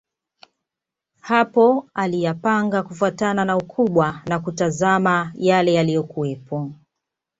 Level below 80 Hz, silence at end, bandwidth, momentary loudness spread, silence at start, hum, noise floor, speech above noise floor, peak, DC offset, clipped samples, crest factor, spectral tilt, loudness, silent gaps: -60 dBFS; 0.65 s; 8 kHz; 10 LU; 1.25 s; none; -86 dBFS; 66 dB; -2 dBFS; under 0.1%; under 0.1%; 18 dB; -6 dB/octave; -20 LUFS; none